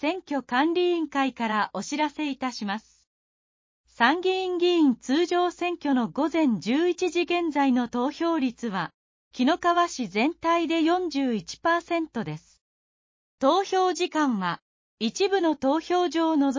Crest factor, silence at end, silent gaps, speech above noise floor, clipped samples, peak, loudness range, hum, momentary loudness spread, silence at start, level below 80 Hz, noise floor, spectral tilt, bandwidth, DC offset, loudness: 20 dB; 0 s; 3.07-3.84 s, 8.94-9.31 s, 12.61-13.38 s, 14.62-14.97 s; over 65 dB; under 0.1%; -6 dBFS; 3 LU; none; 8 LU; 0 s; -66 dBFS; under -90 dBFS; -4.5 dB/octave; 7.6 kHz; under 0.1%; -25 LUFS